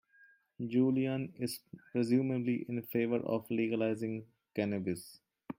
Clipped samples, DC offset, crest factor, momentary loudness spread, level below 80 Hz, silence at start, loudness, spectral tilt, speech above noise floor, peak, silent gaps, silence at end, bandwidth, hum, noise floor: under 0.1%; under 0.1%; 16 dB; 12 LU; -76 dBFS; 0.6 s; -35 LUFS; -7 dB/octave; 32 dB; -18 dBFS; none; 0.05 s; 16.5 kHz; none; -65 dBFS